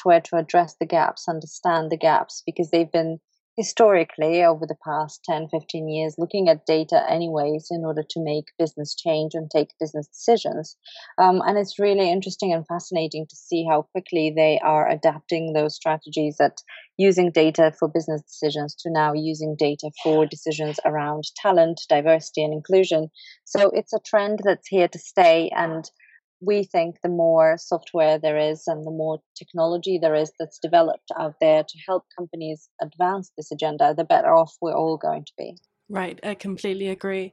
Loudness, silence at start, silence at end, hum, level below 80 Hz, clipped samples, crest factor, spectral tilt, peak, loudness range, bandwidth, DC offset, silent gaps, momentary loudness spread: -22 LUFS; 0 s; 0.05 s; none; -82 dBFS; under 0.1%; 18 dB; -5.5 dB/octave; -4 dBFS; 3 LU; 8.2 kHz; under 0.1%; 3.40-3.56 s, 26.24-26.40 s, 29.26-29.35 s, 32.71-32.79 s; 12 LU